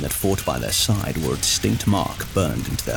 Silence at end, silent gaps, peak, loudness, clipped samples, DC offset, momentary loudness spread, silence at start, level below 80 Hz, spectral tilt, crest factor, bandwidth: 0 s; none; -8 dBFS; -21 LUFS; under 0.1%; under 0.1%; 5 LU; 0 s; -36 dBFS; -4 dB/octave; 14 dB; 19 kHz